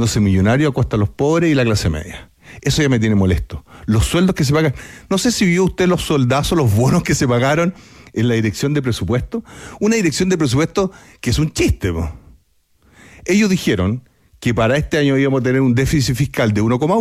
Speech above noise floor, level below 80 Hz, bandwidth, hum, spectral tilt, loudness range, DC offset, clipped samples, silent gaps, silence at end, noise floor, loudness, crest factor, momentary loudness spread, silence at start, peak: 41 dB; -34 dBFS; 15.5 kHz; none; -5.5 dB/octave; 4 LU; under 0.1%; under 0.1%; none; 0 s; -57 dBFS; -16 LUFS; 12 dB; 9 LU; 0 s; -4 dBFS